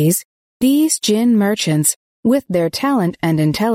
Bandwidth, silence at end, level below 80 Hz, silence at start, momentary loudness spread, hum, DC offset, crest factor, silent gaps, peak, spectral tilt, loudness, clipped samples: 16.5 kHz; 0 s; -54 dBFS; 0 s; 5 LU; none; under 0.1%; 14 dB; 0.25-0.60 s, 1.96-2.23 s; -2 dBFS; -5 dB/octave; -16 LUFS; under 0.1%